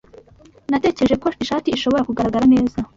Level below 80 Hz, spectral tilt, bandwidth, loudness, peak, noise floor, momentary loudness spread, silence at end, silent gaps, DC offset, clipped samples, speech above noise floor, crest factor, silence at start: -44 dBFS; -6 dB/octave; 7.6 kHz; -18 LUFS; -6 dBFS; -48 dBFS; 7 LU; 0.1 s; none; under 0.1%; under 0.1%; 31 dB; 14 dB; 0.7 s